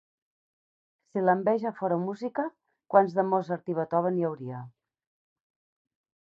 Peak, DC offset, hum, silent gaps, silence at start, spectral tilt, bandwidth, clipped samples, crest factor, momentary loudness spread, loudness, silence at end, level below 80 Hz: -6 dBFS; under 0.1%; none; none; 1.15 s; -9.5 dB/octave; 7.4 kHz; under 0.1%; 24 dB; 12 LU; -28 LUFS; 1.6 s; -76 dBFS